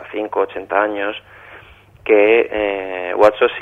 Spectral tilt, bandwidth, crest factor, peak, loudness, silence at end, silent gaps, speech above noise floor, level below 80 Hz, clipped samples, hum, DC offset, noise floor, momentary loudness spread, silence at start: -5.5 dB/octave; 7.8 kHz; 16 dB; 0 dBFS; -16 LUFS; 0 s; none; 27 dB; -52 dBFS; under 0.1%; 50 Hz at -55 dBFS; under 0.1%; -43 dBFS; 12 LU; 0 s